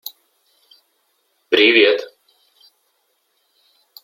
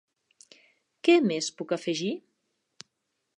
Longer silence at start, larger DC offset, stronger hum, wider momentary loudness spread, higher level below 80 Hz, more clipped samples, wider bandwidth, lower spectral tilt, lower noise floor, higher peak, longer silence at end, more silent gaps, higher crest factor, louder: first, 1.5 s vs 1.05 s; neither; neither; first, 25 LU vs 11 LU; first, -72 dBFS vs -86 dBFS; neither; first, 16.5 kHz vs 10.5 kHz; second, -2.5 dB/octave vs -4 dB/octave; second, -67 dBFS vs -80 dBFS; first, 0 dBFS vs -8 dBFS; first, 2 s vs 1.2 s; neither; about the same, 20 dB vs 22 dB; first, -14 LUFS vs -26 LUFS